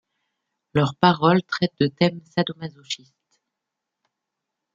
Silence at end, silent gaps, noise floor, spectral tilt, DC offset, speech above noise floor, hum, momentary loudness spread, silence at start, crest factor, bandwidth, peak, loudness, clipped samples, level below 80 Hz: 1.8 s; none; -83 dBFS; -6.5 dB/octave; under 0.1%; 62 dB; none; 14 LU; 0.75 s; 22 dB; 7.6 kHz; -2 dBFS; -22 LUFS; under 0.1%; -62 dBFS